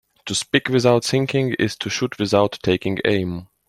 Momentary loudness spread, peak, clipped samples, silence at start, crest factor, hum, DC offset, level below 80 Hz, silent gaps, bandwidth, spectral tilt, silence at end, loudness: 7 LU; -2 dBFS; under 0.1%; 0.25 s; 18 dB; none; under 0.1%; -54 dBFS; none; 15.5 kHz; -5 dB/octave; 0.25 s; -20 LUFS